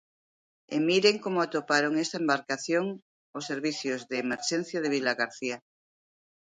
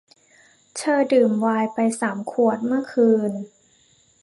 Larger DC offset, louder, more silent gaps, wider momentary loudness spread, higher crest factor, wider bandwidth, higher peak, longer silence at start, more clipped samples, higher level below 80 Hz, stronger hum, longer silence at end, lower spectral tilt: neither; second, -28 LUFS vs -21 LUFS; first, 3.02-3.33 s vs none; about the same, 11 LU vs 10 LU; first, 22 dB vs 16 dB; second, 9.6 kHz vs 11.5 kHz; about the same, -8 dBFS vs -6 dBFS; about the same, 0.7 s vs 0.75 s; neither; about the same, -78 dBFS vs -74 dBFS; neither; first, 0.9 s vs 0.75 s; second, -3.5 dB/octave vs -5.5 dB/octave